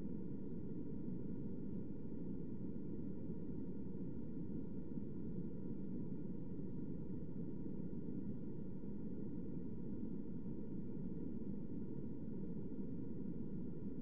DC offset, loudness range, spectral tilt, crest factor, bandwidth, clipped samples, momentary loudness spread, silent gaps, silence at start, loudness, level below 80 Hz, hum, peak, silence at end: 0.6%; 0 LU; -12.5 dB/octave; 14 dB; 3.5 kHz; under 0.1%; 1 LU; none; 0 s; -48 LUFS; -62 dBFS; none; -30 dBFS; 0 s